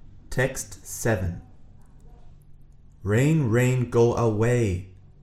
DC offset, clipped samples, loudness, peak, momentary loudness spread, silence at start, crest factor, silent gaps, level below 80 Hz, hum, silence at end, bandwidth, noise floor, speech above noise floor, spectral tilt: under 0.1%; under 0.1%; -24 LUFS; -8 dBFS; 13 LU; 0.05 s; 16 dB; none; -44 dBFS; none; 0.35 s; 15 kHz; -48 dBFS; 26 dB; -6.5 dB/octave